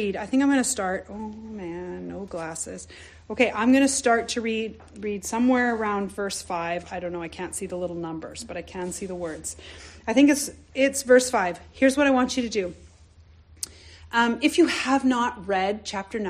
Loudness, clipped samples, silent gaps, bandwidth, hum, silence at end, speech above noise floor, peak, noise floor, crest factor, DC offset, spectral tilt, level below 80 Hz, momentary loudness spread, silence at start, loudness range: -24 LUFS; under 0.1%; none; 14.5 kHz; none; 0 s; 28 dB; -6 dBFS; -52 dBFS; 18 dB; under 0.1%; -3.5 dB/octave; -54 dBFS; 16 LU; 0 s; 9 LU